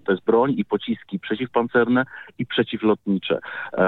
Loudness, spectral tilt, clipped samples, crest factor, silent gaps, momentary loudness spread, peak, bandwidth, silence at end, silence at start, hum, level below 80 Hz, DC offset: -23 LUFS; -9 dB/octave; under 0.1%; 16 dB; none; 9 LU; -6 dBFS; 4.3 kHz; 0 s; 0.05 s; none; -64 dBFS; under 0.1%